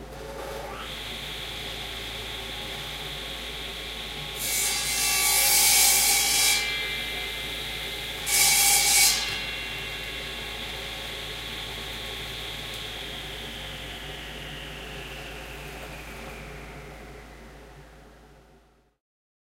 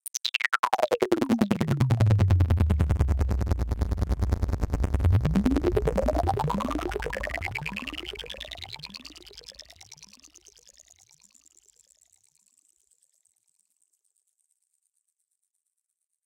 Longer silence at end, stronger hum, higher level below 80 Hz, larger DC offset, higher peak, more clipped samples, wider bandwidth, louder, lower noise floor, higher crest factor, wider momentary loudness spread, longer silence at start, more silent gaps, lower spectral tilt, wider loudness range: second, 1.1 s vs 6.2 s; neither; second, -46 dBFS vs -34 dBFS; neither; about the same, -6 dBFS vs -6 dBFS; neither; about the same, 16 kHz vs 17 kHz; about the same, -24 LUFS vs -26 LUFS; second, -59 dBFS vs -83 dBFS; about the same, 22 dB vs 22 dB; about the same, 21 LU vs 20 LU; second, 0 s vs 0.15 s; second, none vs 0.59-0.63 s; second, 0 dB/octave vs -6.5 dB/octave; about the same, 19 LU vs 18 LU